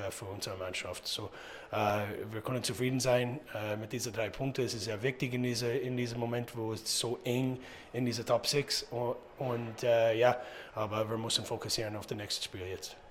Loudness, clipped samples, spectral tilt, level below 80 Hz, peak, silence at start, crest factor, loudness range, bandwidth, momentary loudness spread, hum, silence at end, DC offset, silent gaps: -34 LUFS; under 0.1%; -4 dB/octave; -64 dBFS; -14 dBFS; 0 s; 22 dB; 3 LU; 16.5 kHz; 10 LU; none; 0 s; under 0.1%; none